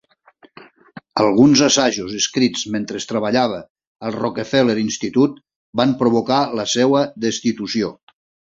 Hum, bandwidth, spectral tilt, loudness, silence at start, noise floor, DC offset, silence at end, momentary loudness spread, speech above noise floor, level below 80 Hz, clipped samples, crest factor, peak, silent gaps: none; 7.8 kHz; -4 dB/octave; -18 LUFS; 0.6 s; -52 dBFS; under 0.1%; 0.55 s; 11 LU; 35 dB; -56 dBFS; under 0.1%; 18 dB; -2 dBFS; 3.70-3.75 s, 3.87-3.95 s, 5.56-5.73 s